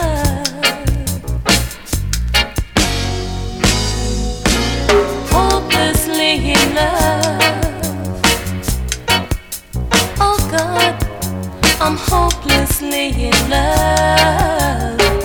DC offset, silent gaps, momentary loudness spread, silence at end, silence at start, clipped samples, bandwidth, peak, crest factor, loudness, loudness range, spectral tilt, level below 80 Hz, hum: under 0.1%; none; 8 LU; 0 s; 0 s; under 0.1%; over 20 kHz; 0 dBFS; 16 dB; -15 LUFS; 3 LU; -3.5 dB/octave; -22 dBFS; none